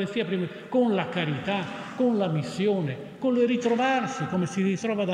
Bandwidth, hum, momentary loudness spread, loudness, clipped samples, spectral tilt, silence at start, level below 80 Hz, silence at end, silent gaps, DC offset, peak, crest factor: 10.5 kHz; none; 6 LU; -26 LUFS; under 0.1%; -6.5 dB/octave; 0 s; -70 dBFS; 0 s; none; under 0.1%; -12 dBFS; 14 dB